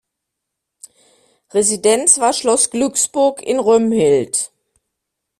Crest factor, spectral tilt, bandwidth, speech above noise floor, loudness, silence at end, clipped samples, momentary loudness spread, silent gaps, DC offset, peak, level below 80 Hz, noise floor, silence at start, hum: 18 dB; -3 dB/octave; 14 kHz; 64 dB; -15 LUFS; 0.95 s; under 0.1%; 8 LU; none; under 0.1%; 0 dBFS; -58 dBFS; -79 dBFS; 1.55 s; none